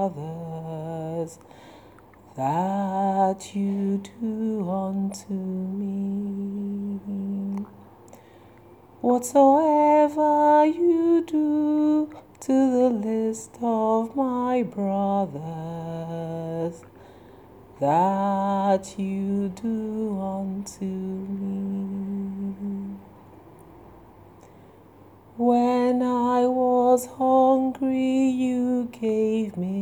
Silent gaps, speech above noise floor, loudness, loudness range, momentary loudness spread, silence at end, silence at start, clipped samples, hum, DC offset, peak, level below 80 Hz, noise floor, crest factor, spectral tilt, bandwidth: none; 27 dB; -24 LUFS; 11 LU; 14 LU; 0 s; 0 s; under 0.1%; none; under 0.1%; -6 dBFS; -64 dBFS; -50 dBFS; 18 dB; -7.5 dB/octave; 19.5 kHz